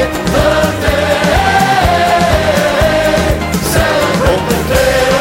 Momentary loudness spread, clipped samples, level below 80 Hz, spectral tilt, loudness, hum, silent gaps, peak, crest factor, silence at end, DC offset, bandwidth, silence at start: 3 LU; under 0.1%; -24 dBFS; -4.5 dB/octave; -11 LUFS; none; none; 0 dBFS; 10 dB; 0 s; under 0.1%; 16 kHz; 0 s